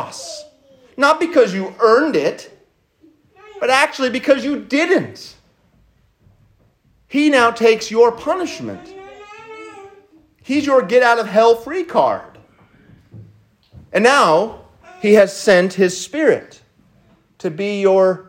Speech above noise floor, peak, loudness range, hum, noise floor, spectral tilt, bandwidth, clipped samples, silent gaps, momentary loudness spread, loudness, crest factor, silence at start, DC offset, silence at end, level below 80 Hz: 42 dB; 0 dBFS; 4 LU; none; -57 dBFS; -4.5 dB/octave; 16 kHz; under 0.1%; none; 22 LU; -15 LUFS; 18 dB; 0 s; under 0.1%; 0.05 s; -60 dBFS